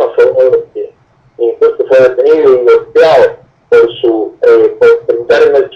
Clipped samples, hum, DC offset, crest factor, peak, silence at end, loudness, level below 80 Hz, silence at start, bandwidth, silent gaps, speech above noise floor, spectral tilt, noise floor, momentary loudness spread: under 0.1%; none; under 0.1%; 8 dB; 0 dBFS; 0 s; -8 LUFS; -50 dBFS; 0 s; 7 kHz; none; 38 dB; -5.5 dB/octave; -44 dBFS; 8 LU